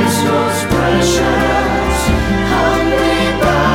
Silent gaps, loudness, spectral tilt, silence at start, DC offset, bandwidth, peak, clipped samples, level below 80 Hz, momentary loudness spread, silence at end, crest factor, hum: none; -13 LUFS; -5 dB/octave; 0 s; under 0.1%; 17.5 kHz; -2 dBFS; under 0.1%; -24 dBFS; 2 LU; 0 s; 10 dB; none